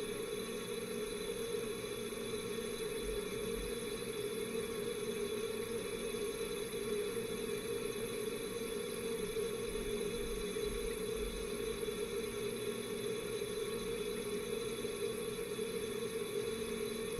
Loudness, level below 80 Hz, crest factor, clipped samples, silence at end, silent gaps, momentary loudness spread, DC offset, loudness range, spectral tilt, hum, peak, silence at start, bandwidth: -40 LUFS; -56 dBFS; 14 dB; under 0.1%; 0 s; none; 2 LU; under 0.1%; 1 LU; -3.5 dB/octave; none; -26 dBFS; 0 s; 16 kHz